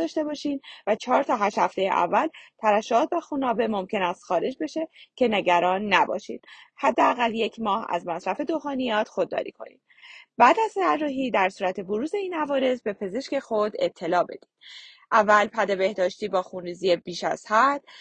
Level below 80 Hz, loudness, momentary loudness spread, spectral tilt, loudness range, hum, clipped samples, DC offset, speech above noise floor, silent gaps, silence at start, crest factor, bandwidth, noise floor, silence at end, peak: -68 dBFS; -24 LUFS; 11 LU; -4.5 dB/octave; 3 LU; none; under 0.1%; under 0.1%; 25 dB; none; 0 s; 20 dB; 9.4 kHz; -49 dBFS; 0 s; -4 dBFS